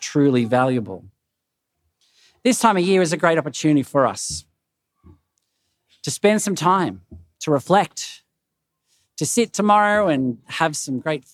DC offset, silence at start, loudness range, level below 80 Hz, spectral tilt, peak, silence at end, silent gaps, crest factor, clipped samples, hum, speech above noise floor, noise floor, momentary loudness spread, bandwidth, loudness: under 0.1%; 0 s; 3 LU; -62 dBFS; -4.5 dB/octave; 0 dBFS; 0.15 s; none; 20 dB; under 0.1%; none; 60 dB; -79 dBFS; 13 LU; 15.5 kHz; -19 LUFS